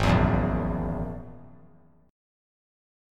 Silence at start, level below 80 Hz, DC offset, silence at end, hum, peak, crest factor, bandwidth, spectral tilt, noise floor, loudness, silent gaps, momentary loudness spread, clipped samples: 0 s; -36 dBFS; under 0.1%; 1 s; none; -8 dBFS; 20 dB; 12 kHz; -7.5 dB/octave; -56 dBFS; -27 LUFS; none; 18 LU; under 0.1%